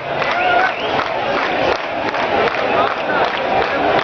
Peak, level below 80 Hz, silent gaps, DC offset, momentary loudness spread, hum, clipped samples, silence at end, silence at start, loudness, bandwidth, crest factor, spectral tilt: -4 dBFS; -46 dBFS; none; under 0.1%; 4 LU; none; under 0.1%; 0 s; 0 s; -17 LUFS; 6.8 kHz; 14 dB; -5 dB/octave